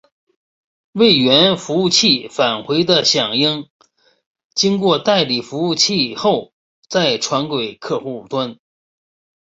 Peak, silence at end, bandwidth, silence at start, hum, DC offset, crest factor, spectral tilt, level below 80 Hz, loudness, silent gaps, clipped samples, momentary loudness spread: 0 dBFS; 0.95 s; 8.2 kHz; 0.95 s; none; under 0.1%; 18 dB; -3.5 dB/octave; -58 dBFS; -15 LUFS; 3.70-3.80 s, 4.26-4.34 s, 4.45-4.50 s, 6.53-6.82 s; under 0.1%; 11 LU